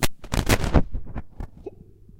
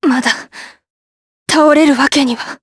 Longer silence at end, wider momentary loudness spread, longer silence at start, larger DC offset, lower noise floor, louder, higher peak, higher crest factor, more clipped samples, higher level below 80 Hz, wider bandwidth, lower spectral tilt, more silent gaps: about the same, 0 s vs 0.05 s; first, 21 LU vs 14 LU; about the same, 0 s vs 0 s; neither; second, -47 dBFS vs under -90 dBFS; second, -24 LUFS vs -12 LUFS; about the same, -2 dBFS vs 0 dBFS; first, 22 dB vs 14 dB; neither; first, -30 dBFS vs -56 dBFS; first, 17 kHz vs 11 kHz; first, -5 dB/octave vs -2.5 dB/octave; second, none vs 0.90-1.46 s